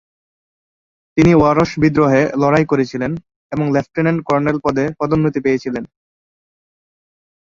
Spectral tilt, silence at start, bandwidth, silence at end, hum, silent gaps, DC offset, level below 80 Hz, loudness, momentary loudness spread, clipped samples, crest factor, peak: -7.5 dB/octave; 1.15 s; 7.6 kHz; 1.6 s; none; 3.36-3.50 s; under 0.1%; -44 dBFS; -16 LUFS; 11 LU; under 0.1%; 16 dB; 0 dBFS